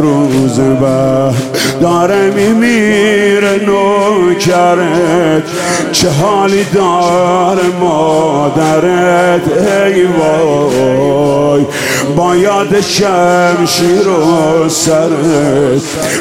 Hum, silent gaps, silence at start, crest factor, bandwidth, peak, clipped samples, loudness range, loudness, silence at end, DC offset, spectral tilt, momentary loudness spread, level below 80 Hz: none; none; 0 s; 8 dB; 16.5 kHz; 0 dBFS; under 0.1%; 1 LU; -9 LUFS; 0 s; 0.3%; -5 dB/octave; 3 LU; -44 dBFS